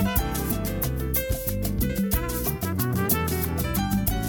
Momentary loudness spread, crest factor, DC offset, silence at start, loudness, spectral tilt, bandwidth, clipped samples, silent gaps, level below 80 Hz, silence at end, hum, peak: 4 LU; 16 dB; under 0.1%; 0 s; -26 LUFS; -5 dB/octave; over 20 kHz; under 0.1%; none; -32 dBFS; 0 s; none; -8 dBFS